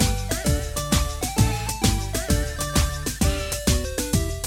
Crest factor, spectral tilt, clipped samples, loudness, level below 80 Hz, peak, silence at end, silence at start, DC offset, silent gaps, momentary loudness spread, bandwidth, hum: 18 dB; -4 dB/octave; under 0.1%; -24 LUFS; -28 dBFS; -4 dBFS; 0 s; 0 s; under 0.1%; none; 2 LU; 17 kHz; none